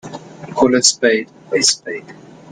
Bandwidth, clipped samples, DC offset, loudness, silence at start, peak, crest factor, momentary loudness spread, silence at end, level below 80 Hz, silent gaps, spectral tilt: 16 kHz; under 0.1%; under 0.1%; -14 LUFS; 0.05 s; 0 dBFS; 18 dB; 19 LU; 0.4 s; -56 dBFS; none; -2 dB/octave